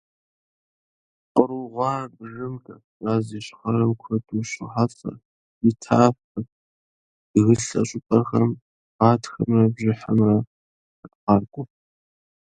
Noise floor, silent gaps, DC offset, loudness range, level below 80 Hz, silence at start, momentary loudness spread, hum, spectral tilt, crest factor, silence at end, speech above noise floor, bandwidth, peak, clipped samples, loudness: under -90 dBFS; 2.84-3.00 s, 5.25-5.61 s, 6.24-6.35 s, 6.52-7.34 s, 8.62-8.99 s, 10.47-11.03 s, 11.15-11.27 s; under 0.1%; 5 LU; -56 dBFS; 1.35 s; 16 LU; none; -7.5 dB/octave; 22 dB; 0.85 s; over 69 dB; 9.4 kHz; 0 dBFS; under 0.1%; -22 LUFS